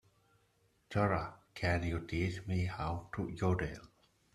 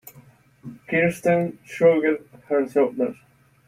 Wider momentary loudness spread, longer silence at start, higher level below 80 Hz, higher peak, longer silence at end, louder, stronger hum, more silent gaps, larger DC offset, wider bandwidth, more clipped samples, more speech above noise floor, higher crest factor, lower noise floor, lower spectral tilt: second, 8 LU vs 12 LU; first, 0.9 s vs 0.05 s; first, -54 dBFS vs -64 dBFS; second, -16 dBFS vs -6 dBFS; about the same, 0.5 s vs 0.55 s; second, -37 LUFS vs -22 LUFS; neither; neither; neither; second, 11.5 kHz vs 16 kHz; neither; first, 38 dB vs 31 dB; about the same, 22 dB vs 18 dB; first, -73 dBFS vs -52 dBFS; about the same, -7 dB/octave vs -7 dB/octave